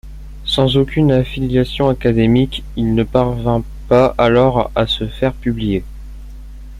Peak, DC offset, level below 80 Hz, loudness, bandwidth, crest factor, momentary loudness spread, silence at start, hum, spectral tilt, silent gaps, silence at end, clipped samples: 0 dBFS; under 0.1%; -30 dBFS; -15 LUFS; 13 kHz; 16 dB; 14 LU; 0.05 s; none; -7.5 dB/octave; none; 0 s; under 0.1%